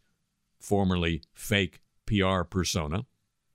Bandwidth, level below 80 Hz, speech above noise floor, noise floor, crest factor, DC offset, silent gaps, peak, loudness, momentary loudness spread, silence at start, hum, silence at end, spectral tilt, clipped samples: 16 kHz; -46 dBFS; 48 dB; -75 dBFS; 20 dB; under 0.1%; none; -8 dBFS; -29 LUFS; 10 LU; 0.65 s; none; 0.5 s; -5 dB/octave; under 0.1%